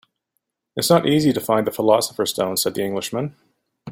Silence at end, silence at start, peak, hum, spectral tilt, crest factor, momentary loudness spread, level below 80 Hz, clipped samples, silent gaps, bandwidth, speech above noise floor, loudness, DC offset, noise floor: 0 s; 0.75 s; -2 dBFS; none; -4.5 dB/octave; 18 dB; 10 LU; -58 dBFS; under 0.1%; none; 16.5 kHz; 56 dB; -20 LUFS; under 0.1%; -76 dBFS